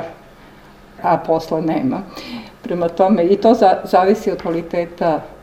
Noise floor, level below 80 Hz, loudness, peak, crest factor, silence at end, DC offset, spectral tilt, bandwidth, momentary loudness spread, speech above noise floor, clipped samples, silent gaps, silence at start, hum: -42 dBFS; -48 dBFS; -17 LUFS; 0 dBFS; 18 dB; 0.1 s; under 0.1%; -7 dB/octave; 16.5 kHz; 16 LU; 26 dB; under 0.1%; none; 0 s; none